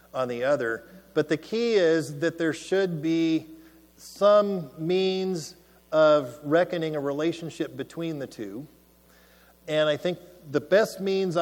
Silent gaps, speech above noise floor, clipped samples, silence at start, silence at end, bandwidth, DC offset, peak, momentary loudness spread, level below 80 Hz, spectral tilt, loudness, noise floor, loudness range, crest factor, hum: none; 32 dB; under 0.1%; 0.15 s; 0 s; 17.5 kHz; under 0.1%; -8 dBFS; 14 LU; -66 dBFS; -5.5 dB/octave; -26 LUFS; -57 dBFS; 7 LU; 18 dB; none